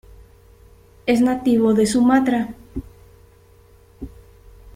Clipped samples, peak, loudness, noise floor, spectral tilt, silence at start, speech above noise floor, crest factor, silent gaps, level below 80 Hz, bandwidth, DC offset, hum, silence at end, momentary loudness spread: under 0.1%; -4 dBFS; -18 LUFS; -50 dBFS; -5.5 dB/octave; 1.05 s; 34 dB; 18 dB; none; -46 dBFS; 15 kHz; under 0.1%; none; 0.05 s; 23 LU